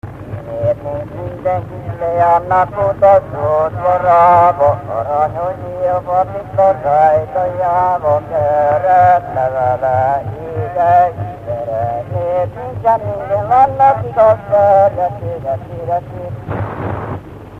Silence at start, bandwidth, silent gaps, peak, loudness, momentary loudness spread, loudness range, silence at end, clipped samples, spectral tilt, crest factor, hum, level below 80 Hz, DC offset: 0.05 s; 7.4 kHz; none; 0 dBFS; -14 LUFS; 13 LU; 4 LU; 0 s; under 0.1%; -8.5 dB/octave; 14 dB; none; -40 dBFS; under 0.1%